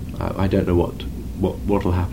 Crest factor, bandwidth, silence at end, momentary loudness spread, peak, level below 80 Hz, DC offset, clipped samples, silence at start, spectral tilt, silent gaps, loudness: 18 dB; 16 kHz; 0 s; 9 LU; -4 dBFS; -32 dBFS; 0.8%; under 0.1%; 0 s; -8.5 dB/octave; none; -22 LUFS